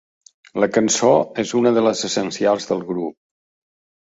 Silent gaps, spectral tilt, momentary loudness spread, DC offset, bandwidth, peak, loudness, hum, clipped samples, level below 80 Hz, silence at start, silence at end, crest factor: none; -4 dB/octave; 11 LU; under 0.1%; 8 kHz; -2 dBFS; -19 LUFS; none; under 0.1%; -62 dBFS; 0.55 s; 1 s; 18 dB